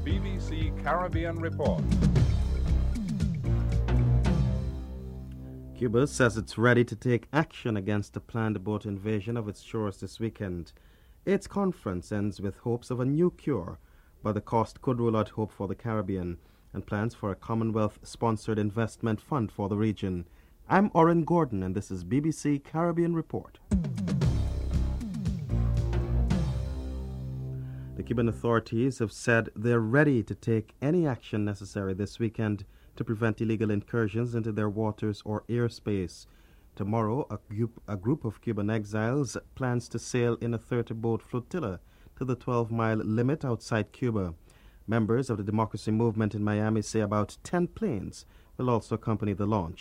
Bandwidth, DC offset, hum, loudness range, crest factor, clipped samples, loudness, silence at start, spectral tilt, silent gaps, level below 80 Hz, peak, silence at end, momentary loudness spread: 12 kHz; under 0.1%; none; 5 LU; 22 dB; under 0.1%; -30 LUFS; 0 s; -7.5 dB/octave; none; -38 dBFS; -8 dBFS; 0 s; 11 LU